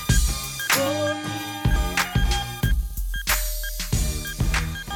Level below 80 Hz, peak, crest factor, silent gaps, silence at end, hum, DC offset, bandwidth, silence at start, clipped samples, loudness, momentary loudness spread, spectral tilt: -26 dBFS; -8 dBFS; 14 dB; none; 0 s; none; under 0.1%; over 20 kHz; 0 s; under 0.1%; -24 LUFS; 7 LU; -3.5 dB/octave